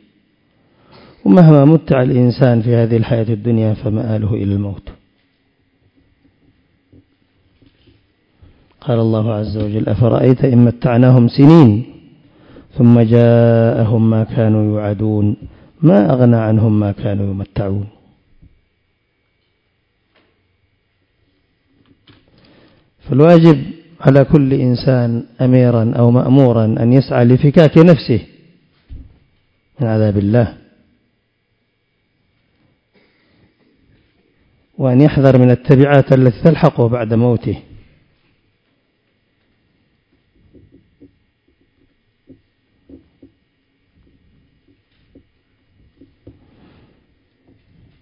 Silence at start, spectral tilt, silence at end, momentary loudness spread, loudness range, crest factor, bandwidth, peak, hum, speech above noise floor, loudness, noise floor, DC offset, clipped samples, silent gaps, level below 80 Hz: 1.25 s; -10.5 dB/octave; 10.4 s; 11 LU; 12 LU; 14 dB; 5.4 kHz; 0 dBFS; none; 54 dB; -12 LUFS; -65 dBFS; under 0.1%; 0.5%; none; -42 dBFS